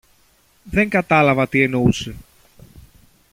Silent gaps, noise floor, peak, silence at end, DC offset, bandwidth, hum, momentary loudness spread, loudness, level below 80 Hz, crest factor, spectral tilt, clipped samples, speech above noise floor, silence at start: none; -57 dBFS; -2 dBFS; 1.1 s; under 0.1%; 16 kHz; none; 9 LU; -17 LUFS; -44 dBFS; 18 dB; -6.5 dB/octave; under 0.1%; 40 dB; 0.65 s